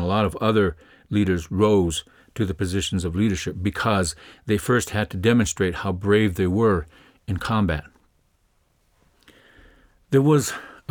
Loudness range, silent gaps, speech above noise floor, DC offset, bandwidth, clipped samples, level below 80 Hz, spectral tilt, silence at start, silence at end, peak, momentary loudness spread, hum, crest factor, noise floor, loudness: 5 LU; none; 43 dB; under 0.1%; over 20 kHz; under 0.1%; -44 dBFS; -5.5 dB/octave; 0 s; 0.15 s; -6 dBFS; 10 LU; none; 18 dB; -65 dBFS; -22 LUFS